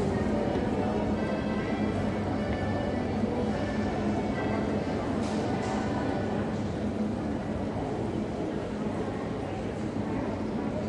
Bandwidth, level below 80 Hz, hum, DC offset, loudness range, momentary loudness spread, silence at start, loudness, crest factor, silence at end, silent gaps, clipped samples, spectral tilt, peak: 11 kHz; -46 dBFS; none; under 0.1%; 3 LU; 4 LU; 0 s; -30 LUFS; 14 dB; 0 s; none; under 0.1%; -7.5 dB/octave; -16 dBFS